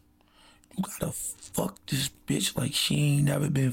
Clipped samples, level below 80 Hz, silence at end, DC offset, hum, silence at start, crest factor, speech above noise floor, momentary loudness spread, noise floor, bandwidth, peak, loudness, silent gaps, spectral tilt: under 0.1%; -54 dBFS; 0 s; under 0.1%; none; 0.75 s; 14 dB; 32 dB; 10 LU; -60 dBFS; 17 kHz; -16 dBFS; -28 LUFS; none; -4.5 dB/octave